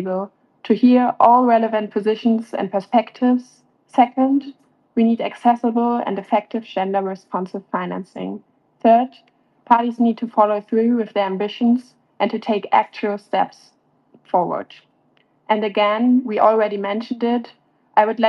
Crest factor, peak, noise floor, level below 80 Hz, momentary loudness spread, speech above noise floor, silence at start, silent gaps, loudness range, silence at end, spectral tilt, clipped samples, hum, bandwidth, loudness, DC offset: 18 dB; 0 dBFS; -60 dBFS; -76 dBFS; 11 LU; 42 dB; 0 s; none; 5 LU; 0 s; -7.5 dB/octave; under 0.1%; none; 6.2 kHz; -19 LUFS; under 0.1%